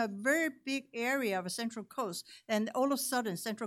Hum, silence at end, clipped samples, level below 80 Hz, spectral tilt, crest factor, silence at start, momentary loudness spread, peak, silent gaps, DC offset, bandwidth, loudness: none; 0 s; under 0.1%; -88 dBFS; -3.5 dB/octave; 16 dB; 0 s; 8 LU; -18 dBFS; none; under 0.1%; 16.5 kHz; -34 LUFS